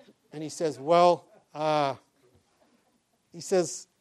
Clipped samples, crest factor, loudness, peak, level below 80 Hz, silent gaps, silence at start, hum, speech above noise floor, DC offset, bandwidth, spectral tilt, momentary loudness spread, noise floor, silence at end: under 0.1%; 20 dB; -27 LUFS; -10 dBFS; -82 dBFS; none; 0.35 s; none; 45 dB; under 0.1%; 13 kHz; -4.5 dB/octave; 21 LU; -71 dBFS; 0.2 s